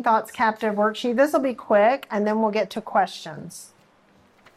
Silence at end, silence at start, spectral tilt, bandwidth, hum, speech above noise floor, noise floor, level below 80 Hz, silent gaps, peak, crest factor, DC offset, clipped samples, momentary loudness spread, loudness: 0.9 s; 0 s; -5 dB/octave; 14.5 kHz; none; 35 dB; -58 dBFS; -70 dBFS; none; -8 dBFS; 16 dB; under 0.1%; under 0.1%; 17 LU; -22 LUFS